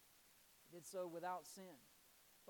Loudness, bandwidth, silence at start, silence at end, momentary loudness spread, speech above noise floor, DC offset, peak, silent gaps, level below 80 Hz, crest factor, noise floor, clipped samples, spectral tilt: -52 LUFS; 19 kHz; 0 s; 0 s; 20 LU; 20 dB; under 0.1%; -36 dBFS; none; under -90 dBFS; 18 dB; -71 dBFS; under 0.1%; -4 dB/octave